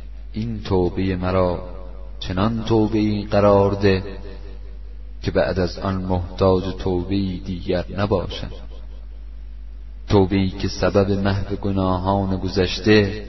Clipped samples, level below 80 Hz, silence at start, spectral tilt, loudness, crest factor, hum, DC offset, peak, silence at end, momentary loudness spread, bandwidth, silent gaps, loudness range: under 0.1%; -34 dBFS; 0 s; -7.5 dB/octave; -21 LUFS; 20 dB; none; 1%; -2 dBFS; 0 s; 22 LU; 6.2 kHz; none; 4 LU